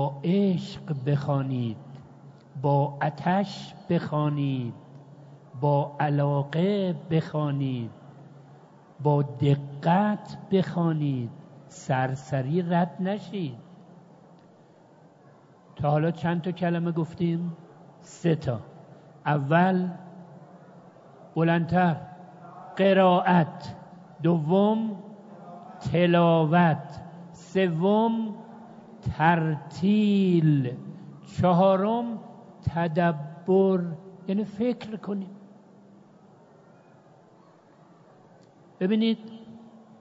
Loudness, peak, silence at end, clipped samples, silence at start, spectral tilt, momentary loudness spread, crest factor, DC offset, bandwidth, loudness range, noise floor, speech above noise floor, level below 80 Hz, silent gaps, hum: -26 LUFS; -6 dBFS; 0.4 s; under 0.1%; 0 s; -8.5 dB/octave; 21 LU; 20 dB; under 0.1%; 7.8 kHz; 8 LU; -55 dBFS; 31 dB; -62 dBFS; none; none